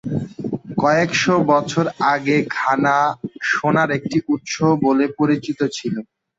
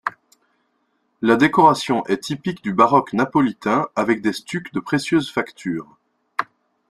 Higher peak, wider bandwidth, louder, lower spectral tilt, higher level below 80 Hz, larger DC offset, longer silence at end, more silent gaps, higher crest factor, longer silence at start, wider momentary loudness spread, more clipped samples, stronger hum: about the same, -2 dBFS vs -2 dBFS; second, 7.8 kHz vs 13 kHz; about the same, -19 LUFS vs -20 LUFS; about the same, -5.5 dB/octave vs -5.5 dB/octave; about the same, -56 dBFS vs -60 dBFS; neither; about the same, 0.35 s vs 0.45 s; neither; about the same, 16 dB vs 20 dB; about the same, 0.05 s vs 0.05 s; second, 9 LU vs 13 LU; neither; neither